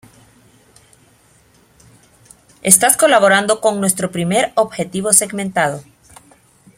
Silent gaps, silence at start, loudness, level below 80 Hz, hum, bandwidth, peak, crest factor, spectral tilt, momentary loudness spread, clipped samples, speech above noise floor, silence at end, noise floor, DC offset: none; 2.65 s; -14 LUFS; -56 dBFS; none; 16.5 kHz; 0 dBFS; 18 dB; -2.5 dB/octave; 10 LU; under 0.1%; 37 dB; 0.95 s; -52 dBFS; under 0.1%